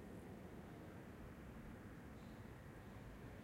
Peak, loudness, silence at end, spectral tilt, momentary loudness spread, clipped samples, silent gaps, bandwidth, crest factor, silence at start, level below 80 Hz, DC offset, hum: -44 dBFS; -57 LUFS; 0 s; -7 dB/octave; 1 LU; under 0.1%; none; 16 kHz; 12 dB; 0 s; -64 dBFS; under 0.1%; none